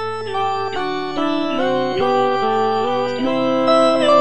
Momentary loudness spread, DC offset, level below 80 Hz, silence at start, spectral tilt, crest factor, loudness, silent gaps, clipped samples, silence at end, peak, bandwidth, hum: 8 LU; 2%; -54 dBFS; 0 s; -5 dB/octave; 14 dB; -18 LUFS; none; under 0.1%; 0 s; -2 dBFS; 10 kHz; none